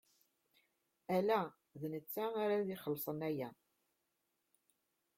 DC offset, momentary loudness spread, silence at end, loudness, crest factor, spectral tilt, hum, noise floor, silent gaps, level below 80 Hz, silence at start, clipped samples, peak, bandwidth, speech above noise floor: under 0.1%; 12 LU; 1.65 s; -40 LUFS; 20 dB; -6.5 dB/octave; none; -85 dBFS; none; -82 dBFS; 1.1 s; under 0.1%; -22 dBFS; 16.5 kHz; 47 dB